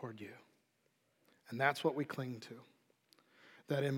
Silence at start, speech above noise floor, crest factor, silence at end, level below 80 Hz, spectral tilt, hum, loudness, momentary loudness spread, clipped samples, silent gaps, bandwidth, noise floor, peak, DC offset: 0 s; 40 dB; 26 dB; 0 s; under -90 dBFS; -6 dB/octave; none; -39 LUFS; 20 LU; under 0.1%; none; 16.5 kHz; -79 dBFS; -16 dBFS; under 0.1%